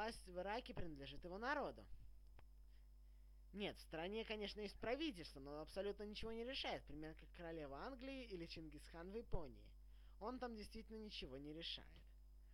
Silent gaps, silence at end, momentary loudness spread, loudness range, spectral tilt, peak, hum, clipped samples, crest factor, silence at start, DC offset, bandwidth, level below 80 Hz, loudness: none; 0 s; 21 LU; 5 LU; -5 dB/octave; -30 dBFS; none; under 0.1%; 22 dB; 0 s; under 0.1%; 17 kHz; -62 dBFS; -51 LUFS